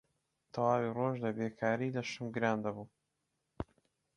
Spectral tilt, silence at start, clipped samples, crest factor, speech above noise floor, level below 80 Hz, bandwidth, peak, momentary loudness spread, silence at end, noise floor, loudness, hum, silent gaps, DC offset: -6.5 dB/octave; 0.55 s; under 0.1%; 20 dB; 49 dB; -64 dBFS; 10.5 kHz; -16 dBFS; 15 LU; 0.55 s; -84 dBFS; -35 LUFS; none; none; under 0.1%